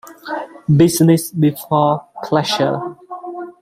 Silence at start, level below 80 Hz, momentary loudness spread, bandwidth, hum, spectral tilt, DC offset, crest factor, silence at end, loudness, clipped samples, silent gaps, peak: 0.05 s; -54 dBFS; 17 LU; 16 kHz; none; -6 dB/octave; under 0.1%; 16 dB; 0.1 s; -16 LUFS; under 0.1%; none; 0 dBFS